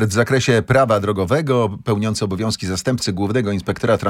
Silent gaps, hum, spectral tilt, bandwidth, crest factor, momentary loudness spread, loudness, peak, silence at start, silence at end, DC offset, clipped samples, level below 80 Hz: none; none; -5.5 dB/octave; 16 kHz; 16 dB; 6 LU; -18 LUFS; -2 dBFS; 0 s; 0 s; under 0.1%; under 0.1%; -48 dBFS